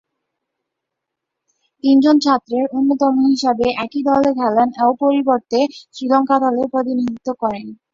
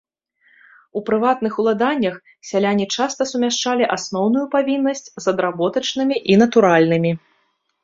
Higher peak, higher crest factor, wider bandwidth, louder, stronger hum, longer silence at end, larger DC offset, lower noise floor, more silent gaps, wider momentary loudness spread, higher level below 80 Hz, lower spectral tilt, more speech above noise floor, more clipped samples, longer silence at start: about the same, -2 dBFS vs -2 dBFS; about the same, 16 dB vs 18 dB; about the same, 7.6 kHz vs 7.8 kHz; about the same, -16 LUFS vs -18 LUFS; neither; second, 0.2 s vs 0.65 s; neither; first, -80 dBFS vs -66 dBFS; neither; about the same, 9 LU vs 9 LU; first, -56 dBFS vs -62 dBFS; about the same, -5 dB/octave vs -5 dB/octave; first, 64 dB vs 48 dB; neither; first, 1.85 s vs 0.95 s